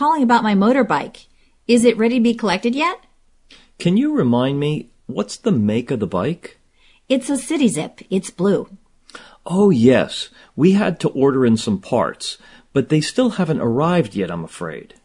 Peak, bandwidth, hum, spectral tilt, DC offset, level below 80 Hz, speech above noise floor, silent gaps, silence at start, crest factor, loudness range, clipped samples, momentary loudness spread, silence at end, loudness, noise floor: 0 dBFS; 11 kHz; none; -6 dB/octave; under 0.1%; -54 dBFS; 37 dB; none; 0 s; 18 dB; 4 LU; under 0.1%; 13 LU; 0.2 s; -18 LUFS; -54 dBFS